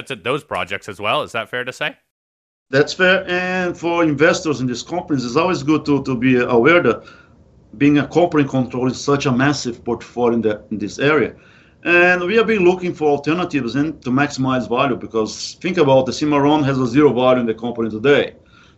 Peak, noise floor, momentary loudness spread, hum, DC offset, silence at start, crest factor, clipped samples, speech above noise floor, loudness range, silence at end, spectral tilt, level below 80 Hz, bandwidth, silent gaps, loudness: 0 dBFS; -49 dBFS; 10 LU; none; under 0.1%; 0 s; 16 dB; under 0.1%; 32 dB; 3 LU; 0.45 s; -5.5 dB/octave; -50 dBFS; 10.5 kHz; 2.11-2.66 s; -17 LUFS